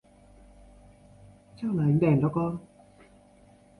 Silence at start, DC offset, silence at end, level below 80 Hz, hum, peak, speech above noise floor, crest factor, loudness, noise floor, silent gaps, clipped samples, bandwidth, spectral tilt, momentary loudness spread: 1.6 s; under 0.1%; 1.2 s; -58 dBFS; none; -10 dBFS; 32 dB; 20 dB; -26 LUFS; -57 dBFS; none; under 0.1%; 10.5 kHz; -10.5 dB/octave; 13 LU